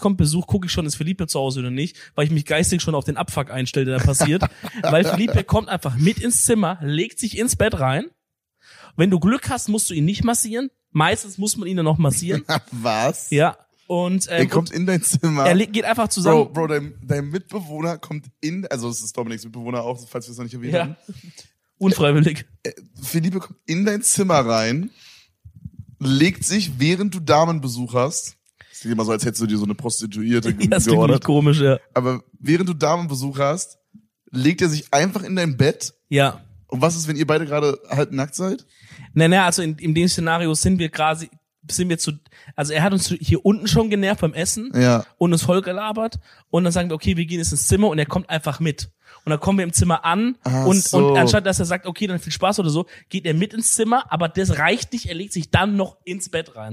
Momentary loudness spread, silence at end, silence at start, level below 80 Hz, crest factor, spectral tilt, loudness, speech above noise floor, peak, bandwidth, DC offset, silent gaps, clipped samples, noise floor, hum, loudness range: 11 LU; 0 s; 0 s; -44 dBFS; 18 dB; -5 dB/octave; -20 LUFS; 44 dB; -2 dBFS; 15.5 kHz; under 0.1%; none; under 0.1%; -64 dBFS; none; 4 LU